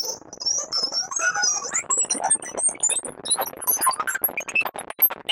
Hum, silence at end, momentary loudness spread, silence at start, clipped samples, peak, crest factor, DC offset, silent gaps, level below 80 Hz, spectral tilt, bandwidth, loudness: none; 0 s; 4 LU; 0 s; under 0.1%; -8 dBFS; 18 dB; under 0.1%; none; -68 dBFS; 1.5 dB/octave; 16.5 kHz; -22 LUFS